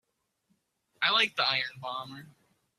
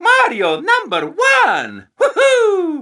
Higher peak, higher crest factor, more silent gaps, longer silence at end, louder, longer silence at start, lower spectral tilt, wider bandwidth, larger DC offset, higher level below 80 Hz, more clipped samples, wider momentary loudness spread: second, -12 dBFS vs 0 dBFS; first, 22 dB vs 14 dB; neither; first, 0.5 s vs 0 s; second, -27 LUFS vs -14 LUFS; first, 1 s vs 0 s; about the same, -2 dB/octave vs -2.5 dB/octave; first, 15 kHz vs 12 kHz; neither; second, -80 dBFS vs -70 dBFS; neither; first, 18 LU vs 8 LU